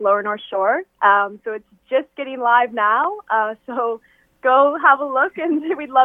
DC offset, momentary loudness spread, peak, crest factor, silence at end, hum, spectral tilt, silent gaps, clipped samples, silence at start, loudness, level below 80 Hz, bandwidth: under 0.1%; 10 LU; 0 dBFS; 18 dB; 0 s; none; -6.5 dB/octave; none; under 0.1%; 0 s; -18 LUFS; -68 dBFS; 3.8 kHz